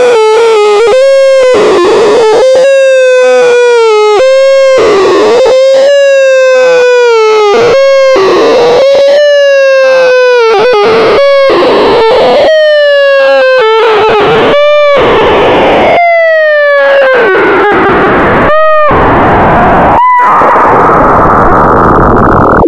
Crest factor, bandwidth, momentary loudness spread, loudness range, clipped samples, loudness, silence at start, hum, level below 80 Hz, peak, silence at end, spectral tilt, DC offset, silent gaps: 4 dB; 10.5 kHz; 1 LU; 1 LU; 6%; -4 LUFS; 0 s; none; -26 dBFS; 0 dBFS; 0 s; -5 dB/octave; under 0.1%; none